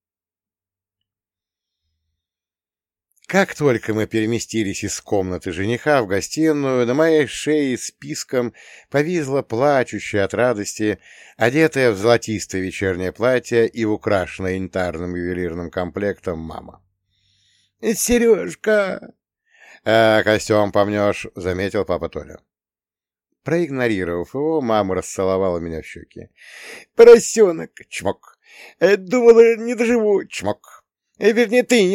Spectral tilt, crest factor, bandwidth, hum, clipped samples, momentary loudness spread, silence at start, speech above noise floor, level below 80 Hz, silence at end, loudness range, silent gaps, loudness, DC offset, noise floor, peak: -5 dB/octave; 18 dB; 15.5 kHz; none; under 0.1%; 13 LU; 3.3 s; over 72 dB; -50 dBFS; 0 s; 8 LU; none; -18 LUFS; under 0.1%; under -90 dBFS; 0 dBFS